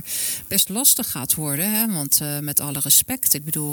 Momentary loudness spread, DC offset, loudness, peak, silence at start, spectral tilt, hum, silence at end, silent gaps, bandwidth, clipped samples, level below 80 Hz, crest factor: 6 LU; under 0.1%; -18 LUFS; -2 dBFS; 0 s; -2 dB/octave; none; 0 s; none; 19.5 kHz; under 0.1%; -56 dBFS; 20 dB